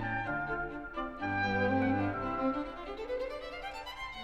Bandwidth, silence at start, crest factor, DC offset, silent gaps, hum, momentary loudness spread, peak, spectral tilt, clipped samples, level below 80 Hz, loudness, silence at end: 12.5 kHz; 0 s; 16 dB; 0.1%; none; none; 11 LU; -18 dBFS; -7 dB/octave; under 0.1%; -52 dBFS; -35 LUFS; 0 s